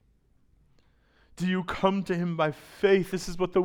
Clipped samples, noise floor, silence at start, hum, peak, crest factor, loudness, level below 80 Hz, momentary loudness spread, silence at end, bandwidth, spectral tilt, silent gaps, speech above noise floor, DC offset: under 0.1%; -64 dBFS; 1.4 s; none; -10 dBFS; 20 dB; -28 LUFS; -52 dBFS; 7 LU; 0 s; 16.5 kHz; -6.5 dB/octave; none; 38 dB; under 0.1%